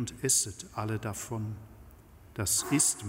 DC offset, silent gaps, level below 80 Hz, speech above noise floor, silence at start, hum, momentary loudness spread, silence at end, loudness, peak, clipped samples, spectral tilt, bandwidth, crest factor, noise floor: under 0.1%; none; -56 dBFS; 22 dB; 0 s; none; 14 LU; 0 s; -30 LUFS; -12 dBFS; under 0.1%; -3 dB/octave; 16 kHz; 20 dB; -53 dBFS